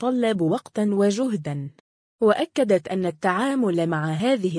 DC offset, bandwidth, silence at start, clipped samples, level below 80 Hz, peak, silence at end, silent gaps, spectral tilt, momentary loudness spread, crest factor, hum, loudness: under 0.1%; 10.5 kHz; 0 s; under 0.1%; -68 dBFS; -8 dBFS; 0 s; 1.80-2.19 s; -6.5 dB/octave; 6 LU; 16 dB; none; -23 LUFS